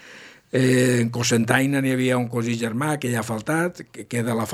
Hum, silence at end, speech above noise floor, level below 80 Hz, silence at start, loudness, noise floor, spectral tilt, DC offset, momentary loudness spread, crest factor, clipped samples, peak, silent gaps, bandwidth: none; 0 s; 24 dB; -64 dBFS; 0.05 s; -22 LUFS; -45 dBFS; -5 dB/octave; under 0.1%; 8 LU; 20 dB; under 0.1%; -2 dBFS; none; 15.5 kHz